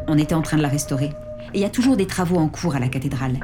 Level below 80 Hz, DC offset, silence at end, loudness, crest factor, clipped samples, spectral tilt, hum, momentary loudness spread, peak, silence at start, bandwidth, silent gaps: -40 dBFS; 0.2%; 0 s; -21 LUFS; 14 dB; under 0.1%; -6 dB/octave; none; 6 LU; -8 dBFS; 0 s; 18 kHz; none